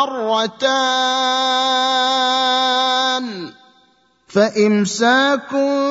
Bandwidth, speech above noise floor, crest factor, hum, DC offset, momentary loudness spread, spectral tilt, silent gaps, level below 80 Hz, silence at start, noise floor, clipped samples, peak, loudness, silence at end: 8 kHz; 40 dB; 16 dB; none; under 0.1%; 4 LU; -3 dB/octave; none; -70 dBFS; 0 s; -57 dBFS; under 0.1%; -2 dBFS; -16 LUFS; 0 s